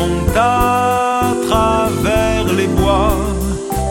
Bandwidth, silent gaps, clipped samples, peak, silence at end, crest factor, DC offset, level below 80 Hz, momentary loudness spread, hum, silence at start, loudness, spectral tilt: 17 kHz; none; under 0.1%; 0 dBFS; 0 s; 14 dB; under 0.1%; -24 dBFS; 5 LU; none; 0 s; -15 LUFS; -5.5 dB/octave